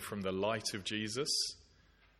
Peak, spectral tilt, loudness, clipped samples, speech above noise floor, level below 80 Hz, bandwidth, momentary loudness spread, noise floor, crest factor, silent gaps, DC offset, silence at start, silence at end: -22 dBFS; -3 dB/octave; -36 LUFS; under 0.1%; 29 dB; -68 dBFS; 16.5 kHz; 5 LU; -66 dBFS; 18 dB; none; under 0.1%; 0 s; 0.6 s